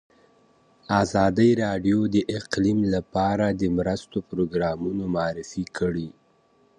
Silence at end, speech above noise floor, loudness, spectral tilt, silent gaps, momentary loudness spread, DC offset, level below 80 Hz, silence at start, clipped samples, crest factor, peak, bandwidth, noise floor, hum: 0.7 s; 38 dB; -24 LUFS; -6.5 dB/octave; none; 9 LU; under 0.1%; -48 dBFS; 0.9 s; under 0.1%; 18 dB; -6 dBFS; 10 kHz; -62 dBFS; none